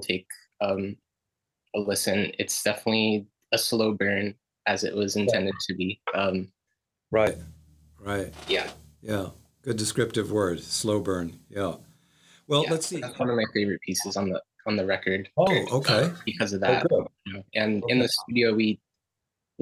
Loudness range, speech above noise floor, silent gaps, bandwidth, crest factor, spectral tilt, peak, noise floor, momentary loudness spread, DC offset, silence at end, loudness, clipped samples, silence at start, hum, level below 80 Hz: 5 LU; 59 dB; none; 16 kHz; 20 dB; -4 dB/octave; -8 dBFS; -85 dBFS; 10 LU; under 0.1%; 0.85 s; -26 LUFS; under 0.1%; 0 s; none; -56 dBFS